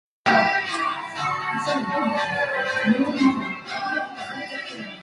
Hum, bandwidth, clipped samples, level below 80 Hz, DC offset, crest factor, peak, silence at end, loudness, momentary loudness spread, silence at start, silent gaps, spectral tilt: none; 11.5 kHz; under 0.1%; -64 dBFS; under 0.1%; 18 dB; -6 dBFS; 0 s; -23 LUFS; 12 LU; 0.25 s; none; -4.5 dB/octave